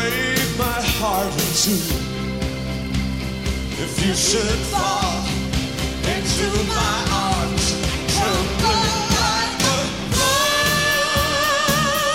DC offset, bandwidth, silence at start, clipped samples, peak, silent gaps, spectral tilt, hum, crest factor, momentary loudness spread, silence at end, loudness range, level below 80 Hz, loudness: 0.4%; 16.5 kHz; 0 s; under 0.1%; -4 dBFS; none; -3 dB/octave; none; 16 dB; 8 LU; 0 s; 4 LU; -30 dBFS; -19 LUFS